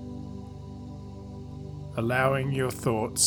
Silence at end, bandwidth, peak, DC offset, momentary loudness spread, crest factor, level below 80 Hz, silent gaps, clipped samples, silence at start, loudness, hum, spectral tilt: 0 s; over 20 kHz; -10 dBFS; under 0.1%; 17 LU; 20 dB; -50 dBFS; none; under 0.1%; 0 s; -29 LUFS; none; -4 dB/octave